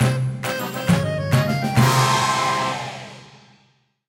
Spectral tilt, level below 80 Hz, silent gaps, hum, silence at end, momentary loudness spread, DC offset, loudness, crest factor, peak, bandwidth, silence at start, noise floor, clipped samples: -5 dB/octave; -50 dBFS; none; none; 0.85 s; 12 LU; under 0.1%; -20 LUFS; 16 dB; -4 dBFS; 16.5 kHz; 0 s; -61 dBFS; under 0.1%